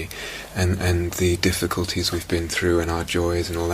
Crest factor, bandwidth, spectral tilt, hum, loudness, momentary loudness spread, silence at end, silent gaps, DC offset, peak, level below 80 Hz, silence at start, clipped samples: 20 dB; 15.5 kHz; -4.5 dB/octave; none; -23 LUFS; 4 LU; 0 s; none; under 0.1%; -2 dBFS; -38 dBFS; 0 s; under 0.1%